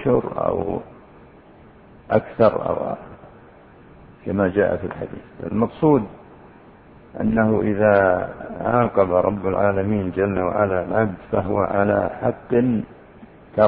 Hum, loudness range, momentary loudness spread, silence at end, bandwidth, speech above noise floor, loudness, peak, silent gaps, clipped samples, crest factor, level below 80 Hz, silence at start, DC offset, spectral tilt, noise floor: none; 5 LU; 13 LU; 0 s; 4.9 kHz; 27 dB; -21 LUFS; -2 dBFS; none; under 0.1%; 20 dB; -48 dBFS; 0 s; under 0.1%; -12 dB/octave; -47 dBFS